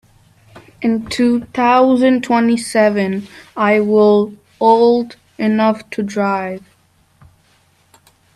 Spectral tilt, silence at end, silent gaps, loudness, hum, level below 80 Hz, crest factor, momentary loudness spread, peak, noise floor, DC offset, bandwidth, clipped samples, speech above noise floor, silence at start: -6 dB/octave; 1.8 s; none; -15 LUFS; none; -56 dBFS; 16 dB; 11 LU; 0 dBFS; -55 dBFS; under 0.1%; 12.5 kHz; under 0.1%; 41 dB; 0.55 s